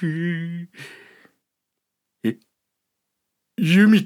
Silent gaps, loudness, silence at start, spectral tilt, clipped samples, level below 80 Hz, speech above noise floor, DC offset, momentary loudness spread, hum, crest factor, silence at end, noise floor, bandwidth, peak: none; -21 LUFS; 0 s; -7 dB/octave; under 0.1%; -80 dBFS; 62 dB; under 0.1%; 25 LU; none; 18 dB; 0 s; -81 dBFS; 14 kHz; -6 dBFS